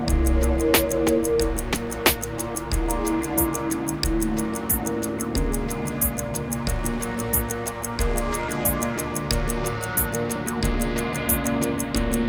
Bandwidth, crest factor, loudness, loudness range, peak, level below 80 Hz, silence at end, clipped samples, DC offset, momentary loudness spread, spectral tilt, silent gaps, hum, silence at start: over 20 kHz; 22 dB; -24 LUFS; 3 LU; -2 dBFS; -30 dBFS; 0 s; under 0.1%; under 0.1%; 5 LU; -4.5 dB/octave; none; none; 0 s